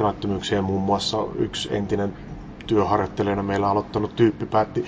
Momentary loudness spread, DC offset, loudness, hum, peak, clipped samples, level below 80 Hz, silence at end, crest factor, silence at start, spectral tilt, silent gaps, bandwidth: 6 LU; under 0.1%; -23 LUFS; none; -6 dBFS; under 0.1%; -44 dBFS; 0 s; 18 dB; 0 s; -6 dB/octave; none; 8 kHz